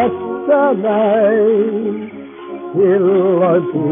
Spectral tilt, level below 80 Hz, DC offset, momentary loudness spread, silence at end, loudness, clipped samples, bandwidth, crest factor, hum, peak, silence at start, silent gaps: -7 dB/octave; -60 dBFS; under 0.1%; 15 LU; 0 s; -14 LUFS; under 0.1%; 3.7 kHz; 10 dB; none; -4 dBFS; 0 s; none